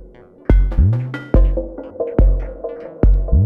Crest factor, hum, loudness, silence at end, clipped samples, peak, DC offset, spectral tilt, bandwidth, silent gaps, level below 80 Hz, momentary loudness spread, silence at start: 12 dB; none; -18 LUFS; 0 s; under 0.1%; -2 dBFS; under 0.1%; -11 dB/octave; 3.3 kHz; none; -16 dBFS; 13 LU; 0 s